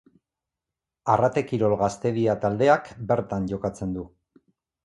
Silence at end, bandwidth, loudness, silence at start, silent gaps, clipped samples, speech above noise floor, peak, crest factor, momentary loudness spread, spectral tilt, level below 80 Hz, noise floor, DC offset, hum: 0.75 s; 11.5 kHz; -24 LUFS; 1.05 s; none; under 0.1%; 64 dB; -4 dBFS; 22 dB; 11 LU; -7 dB/octave; -52 dBFS; -87 dBFS; under 0.1%; none